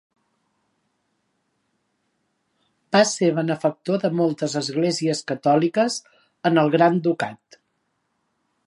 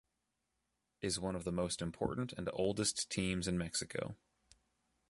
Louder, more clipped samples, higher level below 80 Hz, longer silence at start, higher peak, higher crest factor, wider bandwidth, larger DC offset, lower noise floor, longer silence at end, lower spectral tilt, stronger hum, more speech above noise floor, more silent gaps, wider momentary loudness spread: first, -21 LUFS vs -38 LUFS; neither; second, -74 dBFS vs -60 dBFS; first, 2.9 s vs 1 s; first, -4 dBFS vs -20 dBFS; about the same, 20 dB vs 20 dB; about the same, 11.5 kHz vs 11.5 kHz; neither; second, -73 dBFS vs -86 dBFS; first, 1.3 s vs 0.95 s; about the same, -5 dB/octave vs -4 dB/octave; neither; first, 52 dB vs 47 dB; neither; about the same, 7 LU vs 8 LU